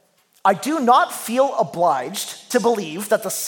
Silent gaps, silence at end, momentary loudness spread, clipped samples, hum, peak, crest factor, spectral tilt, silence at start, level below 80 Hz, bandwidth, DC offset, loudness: none; 0 s; 7 LU; under 0.1%; none; -2 dBFS; 18 dB; -3.5 dB/octave; 0.45 s; -76 dBFS; 17.5 kHz; under 0.1%; -20 LUFS